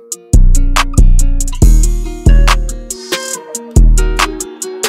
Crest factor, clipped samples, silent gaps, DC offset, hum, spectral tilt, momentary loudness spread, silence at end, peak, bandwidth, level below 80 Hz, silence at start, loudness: 8 dB; under 0.1%; none; under 0.1%; none; -4 dB/octave; 10 LU; 0 s; 0 dBFS; 15 kHz; -10 dBFS; 0.1 s; -13 LUFS